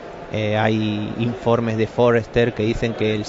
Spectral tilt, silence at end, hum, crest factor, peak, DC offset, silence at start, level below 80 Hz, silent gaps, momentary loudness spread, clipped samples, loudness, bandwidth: -7 dB/octave; 0 s; none; 16 dB; -4 dBFS; under 0.1%; 0 s; -42 dBFS; none; 7 LU; under 0.1%; -20 LUFS; 7.8 kHz